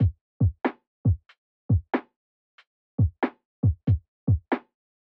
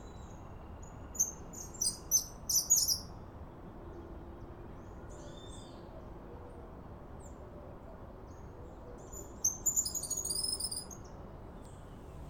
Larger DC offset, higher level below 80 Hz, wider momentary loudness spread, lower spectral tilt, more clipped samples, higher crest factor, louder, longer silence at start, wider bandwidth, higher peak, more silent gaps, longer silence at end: neither; first, -38 dBFS vs -54 dBFS; second, 6 LU vs 20 LU; first, -11.5 dB/octave vs -1.5 dB/octave; neither; second, 16 dB vs 24 dB; first, -28 LUFS vs -32 LUFS; about the same, 0 s vs 0 s; second, 4.4 kHz vs 18 kHz; first, -12 dBFS vs -16 dBFS; first, 0.21-0.40 s, 0.87-1.04 s, 1.38-1.69 s, 2.16-2.58 s, 2.67-2.98 s, 3.45-3.63 s, 4.08-4.27 s vs none; first, 0.55 s vs 0 s